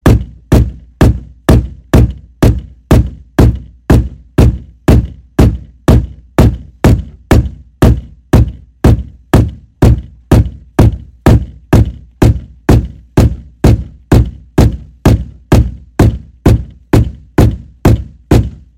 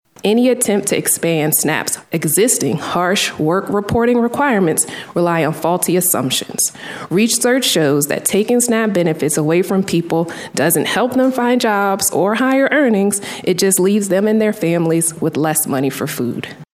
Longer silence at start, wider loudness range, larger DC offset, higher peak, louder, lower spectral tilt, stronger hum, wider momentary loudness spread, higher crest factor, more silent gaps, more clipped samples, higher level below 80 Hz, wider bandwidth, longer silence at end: second, 0.05 s vs 0.25 s; about the same, 1 LU vs 1 LU; first, 0.1% vs under 0.1%; about the same, 0 dBFS vs 0 dBFS; first, -12 LUFS vs -15 LUFS; first, -7.5 dB/octave vs -4 dB/octave; neither; about the same, 5 LU vs 6 LU; about the same, 10 dB vs 14 dB; neither; first, 4% vs under 0.1%; first, -16 dBFS vs -54 dBFS; about the same, 16.5 kHz vs 16 kHz; first, 0.25 s vs 0.1 s